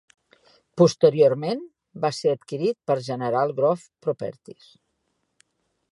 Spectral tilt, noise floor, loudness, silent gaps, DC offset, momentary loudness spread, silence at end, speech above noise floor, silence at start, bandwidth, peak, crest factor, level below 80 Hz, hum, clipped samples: -6.5 dB/octave; -74 dBFS; -23 LUFS; none; under 0.1%; 14 LU; 1.4 s; 52 dB; 0.75 s; 11.5 kHz; -4 dBFS; 20 dB; -74 dBFS; none; under 0.1%